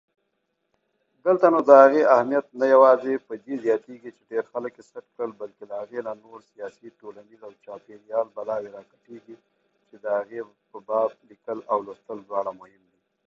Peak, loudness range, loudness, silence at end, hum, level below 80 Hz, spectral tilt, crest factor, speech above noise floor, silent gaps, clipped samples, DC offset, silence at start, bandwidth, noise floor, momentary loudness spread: 0 dBFS; 16 LU; -22 LUFS; 0.75 s; none; -76 dBFS; -6.5 dB/octave; 24 dB; 53 dB; none; under 0.1%; under 0.1%; 1.25 s; 7 kHz; -76 dBFS; 25 LU